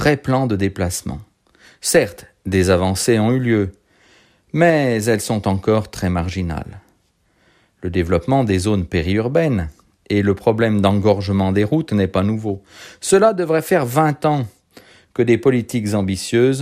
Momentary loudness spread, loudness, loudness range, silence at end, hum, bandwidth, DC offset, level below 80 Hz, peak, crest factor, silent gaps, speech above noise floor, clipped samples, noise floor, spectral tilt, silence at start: 11 LU; -18 LUFS; 4 LU; 0 s; none; 15.5 kHz; under 0.1%; -42 dBFS; -2 dBFS; 16 dB; none; 44 dB; under 0.1%; -61 dBFS; -6 dB/octave; 0 s